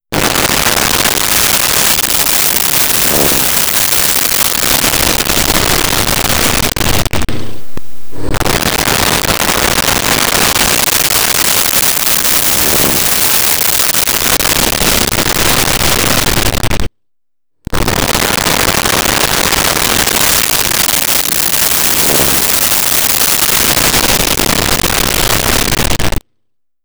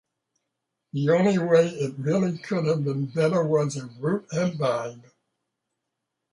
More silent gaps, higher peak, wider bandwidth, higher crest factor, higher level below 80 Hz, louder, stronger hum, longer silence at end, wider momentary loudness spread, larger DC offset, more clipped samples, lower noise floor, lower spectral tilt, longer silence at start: neither; first, 0 dBFS vs -8 dBFS; first, over 20 kHz vs 11 kHz; second, 12 dB vs 18 dB; first, -26 dBFS vs -68 dBFS; first, -9 LUFS vs -24 LUFS; neither; second, 0 s vs 1.35 s; second, 5 LU vs 9 LU; neither; neither; second, -76 dBFS vs -82 dBFS; second, -1.5 dB/octave vs -7 dB/octave; second, 0 s vs 0.95 s